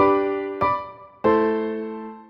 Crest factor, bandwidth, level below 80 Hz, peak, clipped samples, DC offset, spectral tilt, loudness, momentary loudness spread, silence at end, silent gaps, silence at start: 16 dB; 5.8 kHz; -54 dBFS; -6 dBFS; under 0.1%; under 0.1%; -8.5 dB/octave; -23 LUFS; 12 LU; 0.05 s; none; 0 s